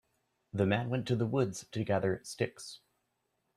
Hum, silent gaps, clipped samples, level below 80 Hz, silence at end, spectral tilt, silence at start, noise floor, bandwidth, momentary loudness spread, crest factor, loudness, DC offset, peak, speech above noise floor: none; none; under 0.1%; -68 dBFS; 0.8 s; -6 dB/octave; 0.55 s; -81 dBFS; 13.5 kHz; 14 LU; 20 dB; -33 LUFS; under 0.1%; -14 dBFS; 48 dB